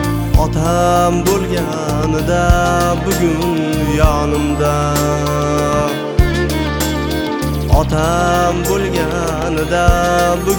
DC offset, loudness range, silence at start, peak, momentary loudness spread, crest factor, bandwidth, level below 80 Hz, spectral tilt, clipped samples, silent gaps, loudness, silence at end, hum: under 0.1%; 1 LU; 0 s; 0 dBFS; 5 LU; 14 dB; over 20 kHz; -22 dBFS; -5.5 dB/octave; under 0.1%; none; -15 LUFS; 0 s; none